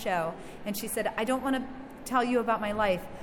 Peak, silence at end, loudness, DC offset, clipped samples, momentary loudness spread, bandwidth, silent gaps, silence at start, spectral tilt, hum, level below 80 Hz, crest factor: -14 dBFS; 0 s; -30 LUFS; under 0.1%; under 0.1%; 10 LU; 17.5 kHz; none; 0 s; -4.5 dB/octave; none; -54 dBFS; 16 dB